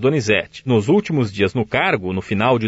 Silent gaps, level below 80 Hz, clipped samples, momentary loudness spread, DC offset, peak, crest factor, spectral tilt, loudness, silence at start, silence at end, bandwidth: none; -50 dBFS; under 0.1%; 5 LU; under 0.1%; -4 dBFS; 14 dB; -6 dB/octave; -18 LUFS; 0 s; 0 s; 8 kHz